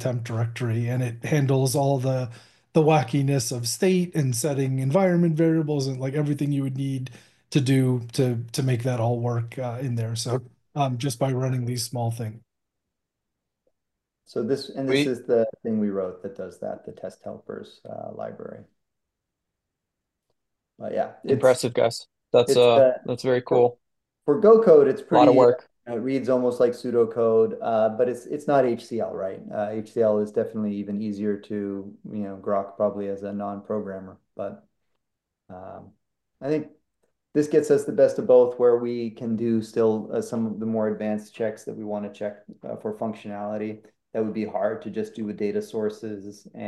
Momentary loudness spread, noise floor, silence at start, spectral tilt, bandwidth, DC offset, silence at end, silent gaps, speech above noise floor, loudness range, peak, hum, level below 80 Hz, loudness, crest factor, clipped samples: 16 LU; -83 dBFS; 0 s; -6.5 dB/octave; 12.5 kHz; under 0.1%; 0 s; none; 60 dB; 13 LU; -4 dBFS; none; -68 dBFS; -24 LUFS; 20 dB; under 0.1%